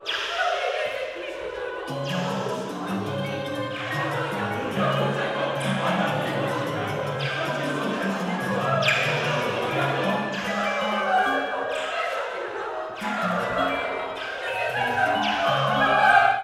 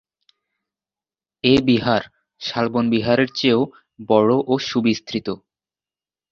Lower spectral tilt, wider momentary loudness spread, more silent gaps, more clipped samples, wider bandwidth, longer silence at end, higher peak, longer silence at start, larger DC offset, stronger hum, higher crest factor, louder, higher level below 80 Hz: about the same, -5 dB/octave vs -6 dB/octave; about the same, 9 LU vs 11 LU; neither; neither; first, 15.5 kHz vs 7.2 kHz; second, 0 s vs 0.95 s; about the same, -4 dBFS vs -2 dBFS; second, 0 s vs 1.45 s; neither; neither; about the same, 20 dB vs 18 dB; second, -25 LUFS vs -19 LUFS; second, -60 dBFS vs -54 dBFS